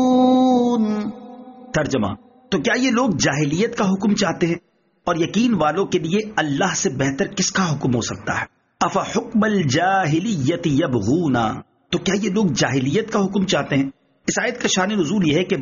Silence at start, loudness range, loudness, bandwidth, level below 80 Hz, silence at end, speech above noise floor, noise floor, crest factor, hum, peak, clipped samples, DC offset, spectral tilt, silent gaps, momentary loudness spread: 0 s; 1 LU; -20 LUFS; 7.4 kHz; -50 dBFS; 0 s; 20 dB; -39 dBFS; 14 dB; none; -4 dBFS; under 0.1%; under 0.1%; -4.5 dB/octave; none; 8 LU